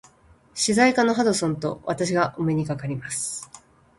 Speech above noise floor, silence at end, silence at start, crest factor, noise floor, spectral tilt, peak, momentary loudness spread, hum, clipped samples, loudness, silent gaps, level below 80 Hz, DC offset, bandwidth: 33 dB; 0.4 s; 0.55 s; 20 dB; -55 dBFS; -4.5 dB/octave; -4 dBFS; 12 LU; none; under 0.1%; -23 LUFS; none; -58 dBFS; under 0.1%; 11.5 kHz